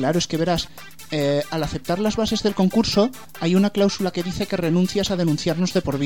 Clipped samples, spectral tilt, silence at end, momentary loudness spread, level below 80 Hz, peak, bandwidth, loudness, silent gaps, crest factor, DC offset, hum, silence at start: under 0.1%; -5.5 dB/octave; 0 s; 7 LU; -44 dBFS; -6 dBFS; 17.5 kHz; -21 LUFS; none; 16 dB; 0.8%; none; 0 s